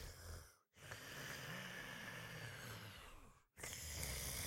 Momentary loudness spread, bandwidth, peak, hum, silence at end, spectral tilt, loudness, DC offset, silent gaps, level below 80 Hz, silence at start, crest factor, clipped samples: 15 LU; 16.5 kHz; -28 dBFS; none; 0 s; -2.5 dB/octave; -50 LUFS; under 0.1%; none; -62 dBFS; 0 s; 24 dB; under 0.1%